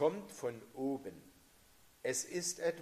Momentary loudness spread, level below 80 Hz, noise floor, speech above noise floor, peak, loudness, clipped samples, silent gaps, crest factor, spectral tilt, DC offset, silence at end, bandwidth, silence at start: 9 LU; -76 dBFS; -65 dBFS; 26 dB; -20 dBFS; -40 LUFS; under 0.1%; none; 20 dB; -3.5 dB/octave; under 0.1%; 0 s; 15 kHz; 0 s